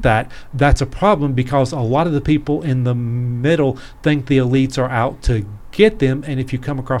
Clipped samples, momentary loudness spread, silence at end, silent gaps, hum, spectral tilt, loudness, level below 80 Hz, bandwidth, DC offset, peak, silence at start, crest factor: under 0.1%; 7 LU; 0 s; none; none; -7 dB/octave; -17 LUFS; -28 dBFS; 11.5 kHz; under 0.1%; 0 dBFS; 0 s; 16 dB